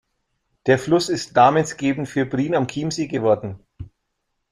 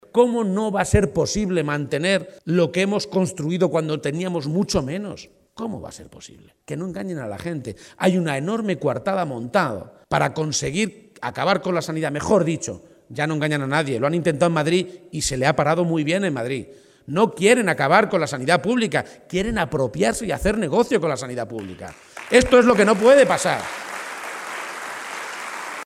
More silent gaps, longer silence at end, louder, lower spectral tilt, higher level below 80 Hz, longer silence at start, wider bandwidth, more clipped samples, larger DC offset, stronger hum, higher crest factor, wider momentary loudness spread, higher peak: neither; first, 0.65 s vs 0 s; about the same, -20 LUFS vs -21 LUFS; about the same, -5.5 dB/octave vs -5 dB/octave; second, -54 dBFS vs -44 dBFS; first, 0.65 s vs 0.15 s; second, 13 kHz vs 15 kHz; neither; neither; neither; about the same, 20 dB vs 22 dB; second, 9 LU vs 14 LU; about the same, -2 dBFS vs 0 dBFS